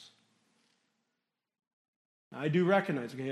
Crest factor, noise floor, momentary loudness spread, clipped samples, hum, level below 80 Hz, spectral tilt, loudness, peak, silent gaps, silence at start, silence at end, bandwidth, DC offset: 22 dB; -87 dBFS; 12 LU; under 0.1%; none; -84 dBFS; -7.5 dB/octave; -31 LUFS; -14 dBFS; 1.73-2.31 s; 0 s; 0 s; 12 kHz; under 0.1%